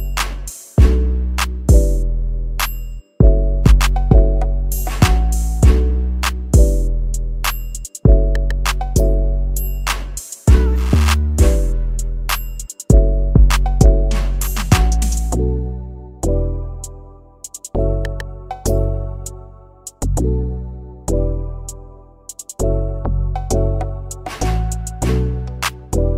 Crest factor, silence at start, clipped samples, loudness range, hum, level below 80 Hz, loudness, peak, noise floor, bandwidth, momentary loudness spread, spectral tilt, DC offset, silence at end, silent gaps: 16 dB; 0 s; under 0.1%; 7 LU; none; -16 dBFS; -18 LUFS; 0 dBFS; -39 dBFS; 16 kHz; 16 LU; -5.5 dB/octave; under 0.1%; 0 s; none